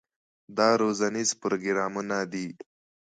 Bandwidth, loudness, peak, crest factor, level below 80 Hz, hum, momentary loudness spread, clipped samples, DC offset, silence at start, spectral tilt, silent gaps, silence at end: 9.6 kHz; -27 LUFS; -8 dBFS; 20 dB; -74 dBFS; none; 13 LU; under 0.1%; under 0.1%; 0.5 s; -3.5 dB/octave; none; 0.55 s